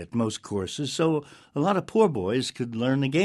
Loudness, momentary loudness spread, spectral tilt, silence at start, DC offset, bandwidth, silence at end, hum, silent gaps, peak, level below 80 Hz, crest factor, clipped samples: -26 LUFS; 8 LU; -5.5 dB/octave; 0 s; under 0.1%; 12.5 kHz; 0 s; none; none; -8 dBFS; -62 dBFS; 18 dB; under 0.1%